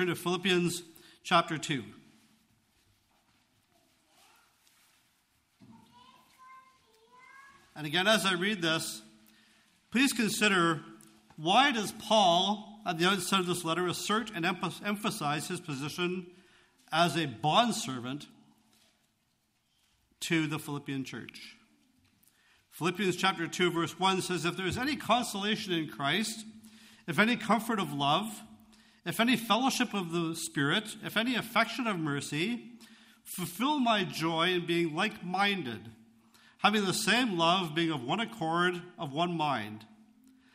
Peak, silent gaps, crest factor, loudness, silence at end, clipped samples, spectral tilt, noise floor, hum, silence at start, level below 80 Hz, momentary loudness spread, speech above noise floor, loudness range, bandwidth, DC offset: -10 dBFS; none; 22 dB; -30 LUFS; 0.7 s; under 0.1%; -4 dB/octave; -75 dBFS; none; 0 s; -72 dBFS; 12 LU; 45 dB; 8 LU; 15.5 kHz; under 0.1%